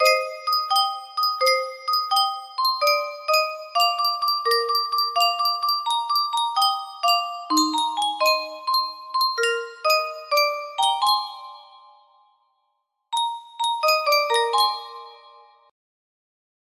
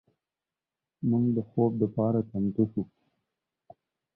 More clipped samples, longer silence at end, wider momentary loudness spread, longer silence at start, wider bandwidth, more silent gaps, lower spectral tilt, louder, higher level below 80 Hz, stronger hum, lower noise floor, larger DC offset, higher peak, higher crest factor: neither; first, 1.55 s vs 1.3 s; about the same, 6 LU vs 7 LU; second, 0 s vs 1 s; first, 15.5 kHz vs 1.5 kHz; neither; second, 1 dB/octave vs -14.5 dB/octave; first, -21 LUFS vs -28 LUFS; second, -78 dBFS vs -62 dBFS; neither; second, -74 dBFS vs under -90 dBFS; neither; first, -6 dBFS vs -12 dBFS; about the same, 18 dB vs 18 dB